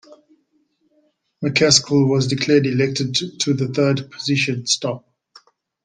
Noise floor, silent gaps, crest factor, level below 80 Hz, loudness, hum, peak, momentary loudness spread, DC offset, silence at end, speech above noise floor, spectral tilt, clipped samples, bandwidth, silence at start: -65 dBFS; none; 20 dB; -58 dBFS; -18 LUFS; none; 0 dBFS; 8 LU; under 0.1%; 0.85 s; 46 dB; -4 dB/octave; under 0.1%; 10 kHz; 0.1 s